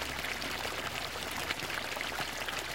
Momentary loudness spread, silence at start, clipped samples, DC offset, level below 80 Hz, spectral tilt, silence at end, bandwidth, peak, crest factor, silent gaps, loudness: 2 LU; 0 s; under 0.1%; 0.2%; -54 dBFS; -2 dB/octave; 0 s; 17 kHz; -14 dBFS; 24 dB; none; -35 LUFS